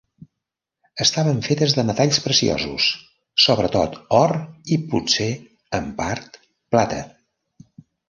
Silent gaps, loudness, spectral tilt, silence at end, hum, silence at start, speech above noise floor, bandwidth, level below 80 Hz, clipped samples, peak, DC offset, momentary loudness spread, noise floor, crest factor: none; -20 LUFS; -4 dB/octave; 1 s; none; 0.95 s; 63 dB; 11 kHz; -48 dBFS; under 0.1%; -2 dBFS; under 0.1%; 12 LU; -83 dBFS; 20 dB